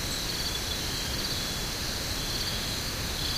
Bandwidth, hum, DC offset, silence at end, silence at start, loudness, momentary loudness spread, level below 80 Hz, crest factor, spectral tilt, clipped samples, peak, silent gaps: 16 kHz; none; under 0.1%; 0 s; 0 s; -30 LUFS; 1 LU; -40 dBFS; 14 dB; -2.5 dB/octave; under 0.1%; -18 dBFS; none